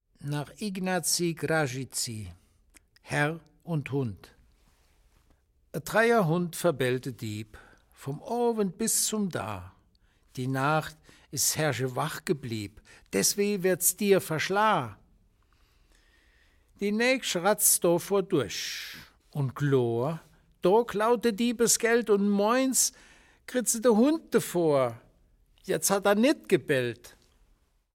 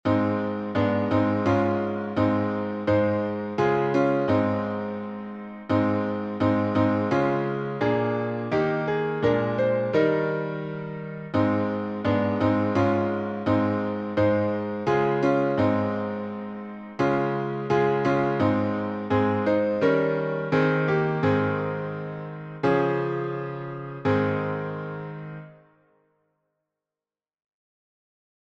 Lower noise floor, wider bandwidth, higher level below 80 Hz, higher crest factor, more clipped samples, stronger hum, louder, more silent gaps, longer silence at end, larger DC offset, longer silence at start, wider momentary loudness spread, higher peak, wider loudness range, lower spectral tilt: second, -67 dBFS vs under -90 dBFS; first, 16.5 kHz vs 7.4 kHz; about the same, -62 dBFS vs -58 dBFS; about the same, 20 dB vs 16 dB; neither; neither; about the same, -27 LUFS vs -25 LUFS; neither; second, 0.85 s vs 2.9 s; neither; first, 0.2 s vs 0.05 s; first, 14 LU vs 11 LU; about the same, -10 dBFS vs -10 dBFS; about the same, 6 LU vs 4 LU; second, -4 dB/octave vs -8.5 dB/octave